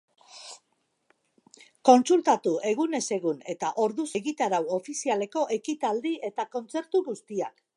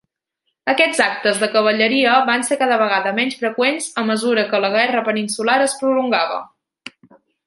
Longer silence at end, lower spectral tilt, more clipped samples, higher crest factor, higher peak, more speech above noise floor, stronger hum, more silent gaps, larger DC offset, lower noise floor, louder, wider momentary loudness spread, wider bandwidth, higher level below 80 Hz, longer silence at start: second, 0.25 s vs 0.6 s; first, -4 dB/octave vs -2.5 dB/octave; neither; first, 22 dB vs 16 dB; about the same, -4 dBFS vs -2 dBFS; second, 48 dB vs 57 dB; neither; neither; neither; about the same, -74 dBFS vs -74 dBFS; second, -27 LUFS vs -17 LUFS; first, 13 LU vs 6 LU; about the same, 11.5 kHz vs 12 kHz; second, -82 dBFS vs -70 dBFS; second, 0.35 s vs 0.65 s